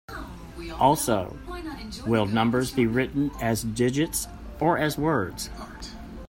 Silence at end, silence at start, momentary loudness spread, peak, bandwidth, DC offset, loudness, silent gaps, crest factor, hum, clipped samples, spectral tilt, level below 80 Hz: 0 s; 0.1 s; 16 LU; -6 dBFS; 16.5 kHz; under 0.1%; -25 LUFS; none; 20 dB; none; under 0.1%; -5 dB/octave; -44 dBFS